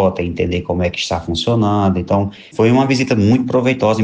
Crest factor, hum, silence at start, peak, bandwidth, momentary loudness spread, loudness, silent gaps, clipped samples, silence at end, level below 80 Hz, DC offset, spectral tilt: 12 dB; none; 0 s; -4 dBFS; 9.6 kHz; 6 LU; -16 LUFS; none; under 0.1%; 0 s; -40 dBFS; under 0.1%; -6.5 dB/octave